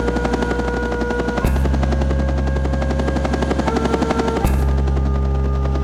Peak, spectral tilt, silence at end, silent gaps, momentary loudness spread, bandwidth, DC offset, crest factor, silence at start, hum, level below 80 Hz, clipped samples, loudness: -6 dBFS; -7 dB/octave; 0 s; none; 2 LU; 13 kHz; under 0.1%; 12 dB; 0 s; none; -20 dBFS; under 0.1%; -19 LUFS